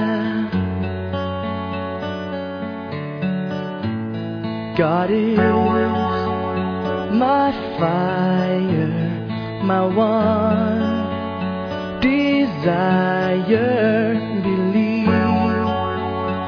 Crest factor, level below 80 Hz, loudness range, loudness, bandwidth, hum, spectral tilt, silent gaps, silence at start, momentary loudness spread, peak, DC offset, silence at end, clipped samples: 16 dB; -50 dBFS; 7 LU; -20 LUFS; 5.4 kHz; none; -9 dB/octave; none; 0 s; 9 LU; -4 dBFS; under 0.1%; 0 s; under 0.1%